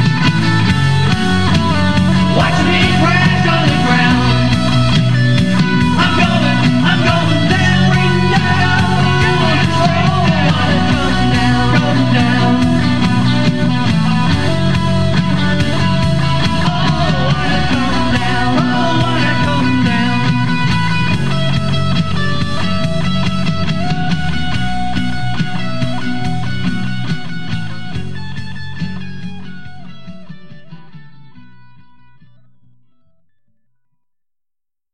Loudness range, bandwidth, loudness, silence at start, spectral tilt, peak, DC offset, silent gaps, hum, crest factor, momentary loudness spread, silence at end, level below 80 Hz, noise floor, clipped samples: 10 LU; 11 kHz; -14 LUFS; 0 s; -6 dB/octave; 0 dBFS; 8%; none; none; 14 dB; 9 LU; 0 s; -32 dBFS; -79 dBFS; under 0.1%